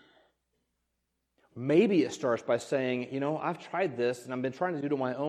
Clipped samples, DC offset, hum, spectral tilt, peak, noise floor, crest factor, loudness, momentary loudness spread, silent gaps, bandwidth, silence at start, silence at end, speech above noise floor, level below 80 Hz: under 0.1%; under 0.1%; none; -6 dB/octave; -12 dBFS; -81 dBFS; 20 dB; -30 LUFS; 9 LU; none; 13 kHz; 1.55 s; 0 s; 52 dB; -78 dBFS